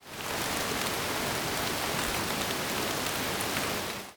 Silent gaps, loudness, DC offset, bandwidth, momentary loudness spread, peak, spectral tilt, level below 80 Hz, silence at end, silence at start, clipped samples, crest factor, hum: none; -30 LUFS; under 0.1%; over 20 kHz; 1 LU; -12 dBFS; -2.5 dB/octave; -52 dBFS; 0 s; 0 s; under 0.1%; 20 dB; none